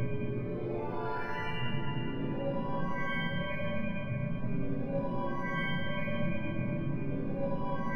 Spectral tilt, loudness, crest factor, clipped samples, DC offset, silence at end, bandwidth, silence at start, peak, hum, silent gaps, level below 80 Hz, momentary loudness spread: -8.5 dB/octave; -35 LUFS; 12 dB; under 0.1%; 1%; 0 s; 6.2 kHz; 0 s; -20 dBFS; none; none; -48 dBFS; 2 LU